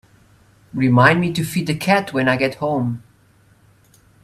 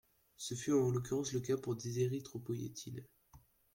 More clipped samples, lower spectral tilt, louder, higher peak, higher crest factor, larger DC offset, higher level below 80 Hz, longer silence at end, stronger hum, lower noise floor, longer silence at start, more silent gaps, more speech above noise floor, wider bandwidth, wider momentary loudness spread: neither; about the same, -6 dB/octave vs -6 dB/octave; first, -18 LUFS vs -38 LUFS; first, 0 dBFS vs -22 dBFS; about the same, 20 dB vs 16 dB; neither; first, -52 dBFS vs -70 dBFS; first, 1.25 s vs 0.35 s; neither; second, -54 dBFS vs -65 dBFS; first, 0.75 s vs 0.4 s; neither; first, 37 dB vs 28 dB; about the same, 15 kHz vs 16.5 kHz; second, 11 LU vs 14 LU